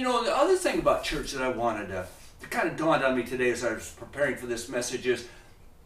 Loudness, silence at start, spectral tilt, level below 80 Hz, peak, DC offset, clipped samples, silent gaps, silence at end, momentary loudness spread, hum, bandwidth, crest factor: -28 LUFS; 0 s; -4 dB/octave; -50 dBFS; -10 dBFS; under 0.1%; under 0.1%; none; 0.15 s; 12 LU; none; 15.5 kHz; 18 dB